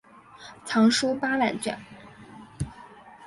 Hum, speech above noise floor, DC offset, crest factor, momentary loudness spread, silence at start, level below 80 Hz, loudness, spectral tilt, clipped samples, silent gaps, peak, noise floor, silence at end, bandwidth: none; 23 dB; under 0.1%; 18 dB; 26 LU; 0.4 s; -54 dBFS; -25 LUFS; -4 dB/octave; under 0.1%; none; -10 dBFS; -48 dBFS; 0 s; 11.5 kHz